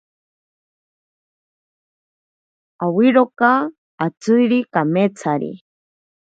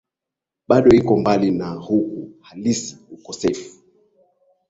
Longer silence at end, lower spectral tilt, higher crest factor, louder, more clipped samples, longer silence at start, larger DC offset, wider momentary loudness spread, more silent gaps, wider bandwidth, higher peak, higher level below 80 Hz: second, 0.7 s vs 1 s; about the same, -7 dB/octave vs -6 dB/octave; about the same, 20 dB vs 18 dB; about the same, -17 LUFS vs -18 LUFS; neither; first, 2.8 s vs 0.7 s; neither; second, 11 LU vs 20 LU; first, 3.78-3.98 s, 4.17-4.21 s vs none; about the same, 8 kHz vs 8 kHz; about the same, 0 dBFS vs -2 dBFS; second, -70 dBFS vs -50 dBFS